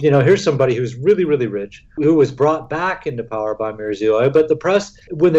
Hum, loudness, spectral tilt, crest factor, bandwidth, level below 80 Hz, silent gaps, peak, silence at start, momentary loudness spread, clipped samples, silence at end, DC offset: none; -17 LUFS; -7 dB/octave; 12 dB; 8 kHz; -50 dBFS; none; -4 dBFS; 0 s; 9 LU; under 0.1%; 0 s; under 0.1%